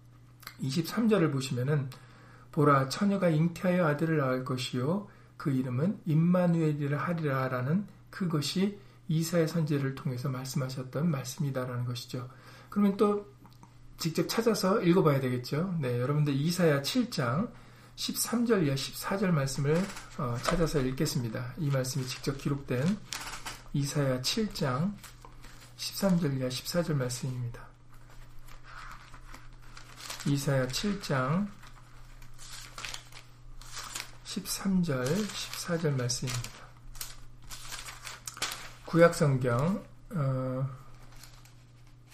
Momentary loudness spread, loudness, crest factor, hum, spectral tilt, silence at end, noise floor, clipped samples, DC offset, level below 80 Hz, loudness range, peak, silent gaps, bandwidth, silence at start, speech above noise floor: 18 LU; -30 LUFS; 24 dB; none; -5.5 dB/octave; 0.2 s; -54 dBFS; under 0.1%; under 0.1%; -52 dBFS; 7 LU; -8 dBFS; none; 15.5 kHz; 0.05 s; 24 dB